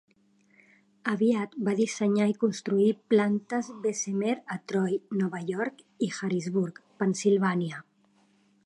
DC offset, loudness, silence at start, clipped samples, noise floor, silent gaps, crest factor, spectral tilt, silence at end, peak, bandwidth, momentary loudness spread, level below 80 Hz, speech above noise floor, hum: under 0.1%; -28 LUFS; 1.05 s; under 0.1%; -65 dBFS; none; 18 dB; -6 dB/octave; 0.85 s; -12 dBFS; 11 kHz; 8 LU; -78 dBFS; 38 dB; none